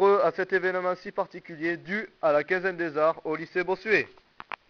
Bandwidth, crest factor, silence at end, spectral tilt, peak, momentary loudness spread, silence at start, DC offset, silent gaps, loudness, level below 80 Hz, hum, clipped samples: 6.6 kHz; 18 dB; 0.6 s; -3.5 dB/octave; -8 dBFS; 9 LU; 0 s; under 0.1%; none; -27 LUFS; -68 dBFS; none; under 0.1%